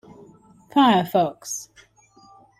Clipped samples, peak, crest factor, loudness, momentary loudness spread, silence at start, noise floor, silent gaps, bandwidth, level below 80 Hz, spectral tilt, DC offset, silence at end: under 0.1%; -6 dBFS; 18 dB; -21 LUFS; 14 LU; 0.75 s; -54 dBFS; none; 15.5 kHz; -66 dBFS; -4.5 dB/octave; under 0.1%; 0.95 s